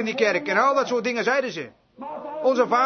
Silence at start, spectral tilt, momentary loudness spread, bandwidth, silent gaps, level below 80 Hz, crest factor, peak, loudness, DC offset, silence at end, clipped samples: 0 s; -4 dB/octave; 16 LU; 6.6 kHz; none; -72 dBFS; 18 dB; -6 dBFS; -22 LUFS; under 0.1%; 0 s; under 0.1%